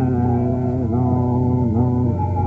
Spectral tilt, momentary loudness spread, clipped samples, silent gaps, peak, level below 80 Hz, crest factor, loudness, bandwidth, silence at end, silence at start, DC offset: -12.5 dB/octave; 2 LU; under 0.1%; none; -6 dBFS; -40 dBFS; 12 dB; -19 LUFS; 2.7 kHz; 0 s; 0 s; under 0.1%